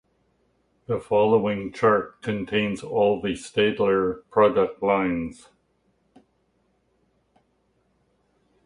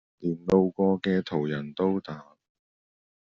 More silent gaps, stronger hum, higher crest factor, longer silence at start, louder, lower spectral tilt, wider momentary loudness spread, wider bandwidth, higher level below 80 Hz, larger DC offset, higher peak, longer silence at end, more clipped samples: neither; neither; about the same, 20 dB vs 20 dB; first, 0.9 s vs 0.2 s; first, -23 LUFS vs -27 LUFS; about the same, -6 dB/octave vs -6.5 dB/octave; about the same, 10 LU vs 9 LU; first, 11 kHz vs 7 kHz; first, -56 dBFS vs -64 dBFS; neither; about the same, -6 dBFS vs -8 dBFS; first, 3.3 s vs 1.1 s; neither